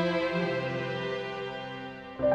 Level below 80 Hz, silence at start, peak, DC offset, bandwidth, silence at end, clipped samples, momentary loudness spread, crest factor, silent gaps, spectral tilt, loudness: -60 dBFS; 0 s; -16 dBFS; under 0.1%; 8.8 kHz; 0 s; under 0.1%; 11 LU; 16 dB; none; -6.5 dB/octave; -32 LUFS